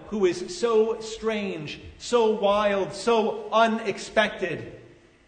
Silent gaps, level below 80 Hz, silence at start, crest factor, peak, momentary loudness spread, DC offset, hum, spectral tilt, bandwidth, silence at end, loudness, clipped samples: none; -56 dBFS; 0 s; 16 dB; -8 dBFS; 11 LU; under 0.1%; none; -4.5 dB/octave; 9.6 kHz; 0.4 s; -25 LUFS; under 0.1%